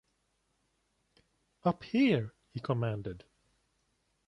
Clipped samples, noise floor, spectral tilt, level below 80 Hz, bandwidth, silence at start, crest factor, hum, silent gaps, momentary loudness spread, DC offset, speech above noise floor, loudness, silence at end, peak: under 0.1%; -77 dBFS; -8.5 dB/octave; -64 dBFS; 9.6 kHz; 1.65 s; 20 dB; none; none; 15 LU; under 0.1%; 46 dB; -33 LUFS; 1.1 s; -16 dBFS